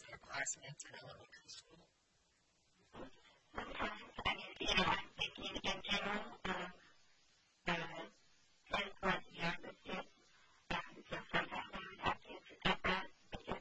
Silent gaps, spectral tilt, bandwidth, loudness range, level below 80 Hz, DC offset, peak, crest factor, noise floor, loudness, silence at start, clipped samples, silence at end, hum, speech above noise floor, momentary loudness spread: none; -3 dB/octave; 8.2 kHz; 10 LU; -62 dBFS; under 0.1%; -16 dBFS; 28 dB; -77 dBFS; -42 LUFS; 0 s; under 0.1%; 0 s; none; 34 dB; 18 LU